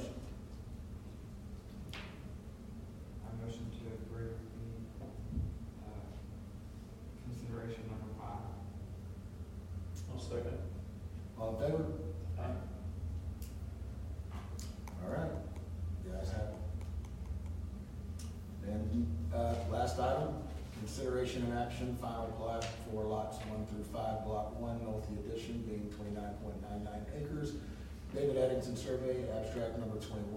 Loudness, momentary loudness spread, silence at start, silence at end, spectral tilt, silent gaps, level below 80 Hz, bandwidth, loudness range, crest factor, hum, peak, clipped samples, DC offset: -42 LUFS; 13 LU; 0 s; 0 s; -7 dB/octave; none; -50 dBFS; 16 kHz; 8 LU; 18 dB; none; -22 dBFS; under 0.1%; under 0.1%